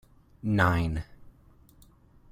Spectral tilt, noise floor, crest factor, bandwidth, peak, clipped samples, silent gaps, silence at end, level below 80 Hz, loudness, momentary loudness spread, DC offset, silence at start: -7.5 dB/octave; -57 dBFS; 22 dB; 15.5 kHz; -8 dBFS; under 0.1%; none; 1.05 s; -46 dBFS; -28 LUFS; 14 LU; under 0.1%; 0.45 s